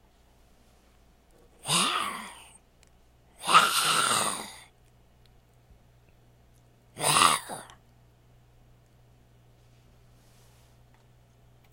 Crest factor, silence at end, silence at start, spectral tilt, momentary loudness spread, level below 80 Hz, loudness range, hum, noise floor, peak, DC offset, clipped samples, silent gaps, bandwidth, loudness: 28 dB; 4.1 s; 1.65 s; -1 dB/octave; 22 LU; -64 dBFS; 7 LU; none; -60 dBFS; -4 dBFS; under 0.1%; under 0.1%; none; 16.5 kHz; -24 LUFS